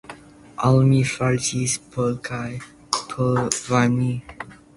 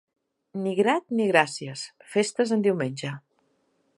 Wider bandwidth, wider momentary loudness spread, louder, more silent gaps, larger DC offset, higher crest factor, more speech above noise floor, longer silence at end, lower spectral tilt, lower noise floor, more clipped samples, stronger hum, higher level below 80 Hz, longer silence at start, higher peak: about the same, 11.5 kHz vs 11.5 kHz; first, 18 LU vs 14 LU; first, -21 LUFS vs -25 LUFS; neither; neither; about the same, 20 dB vs 24 dB; second, 22 dB vs 45 dB; second, 0.25 s vs 0.8 s; about the same, -5 dB/octave vs -5 dB/octave; second, -43 dBFS vs -70 dBFS; neither; neither; first, -50 dBFS vs -78 dBFS; second, 0.1 s vs 0.55 s; about the same, -2 dBFS vs -4 dBFS